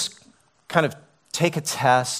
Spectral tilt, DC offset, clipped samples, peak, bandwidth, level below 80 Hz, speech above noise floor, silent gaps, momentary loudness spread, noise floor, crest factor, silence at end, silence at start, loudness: -3.5 dB/octave; under 0.1%; under 0.1%; -4 dBFS; 16 kHz; -66 dBFS; 36 dB; none; 9 LU; -57 dBFS; 20 dB; 0 s; 0 s; -23 LUFS